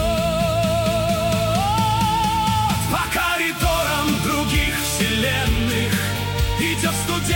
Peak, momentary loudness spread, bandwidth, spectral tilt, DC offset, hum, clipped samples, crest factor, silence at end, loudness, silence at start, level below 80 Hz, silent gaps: -4 dBFS; 2 LU; 17 kHz; -4 dB/octave; under 0.1%; none; under 0.1%; 14 dB; 0 s; -20 LUFS; 0 s; -30 dBFS; none